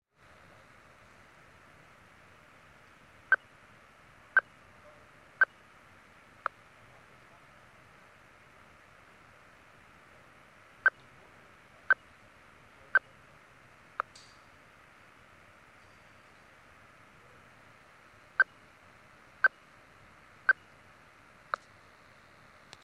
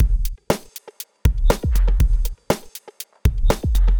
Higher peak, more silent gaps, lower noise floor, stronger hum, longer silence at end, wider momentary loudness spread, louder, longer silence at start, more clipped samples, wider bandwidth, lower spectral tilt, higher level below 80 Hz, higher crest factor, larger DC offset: second, -12 dBFS vs -2 dBFS; neither; first, -59 dBFS vs -39 dBFS; neither; first, 2.3 s vs 0 s; first, 28 LU vs 16 LU; second, -31 LUFS vs -22 LUFS; first, 3.3 s vs 0 s; neither; second, 12 kHz vs over 20 kHz; second, -3 dB/octave vs -5.5 dB/octave; second, -74 dBFS vs -20 dBFS; first, 26 dB vs 16 dB; neither